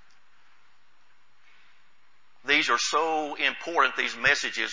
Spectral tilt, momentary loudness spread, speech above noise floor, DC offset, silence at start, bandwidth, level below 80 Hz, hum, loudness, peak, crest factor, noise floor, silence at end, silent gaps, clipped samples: -1 dB/octave; 5 LU; 39 dB; 0.4%; 2.45 s; 7.8 kHz; -66 dBFS; none; -24 LUFS; -6 dBFS; 22 dB; -65 dBFS; 0 s; none; under 0.1%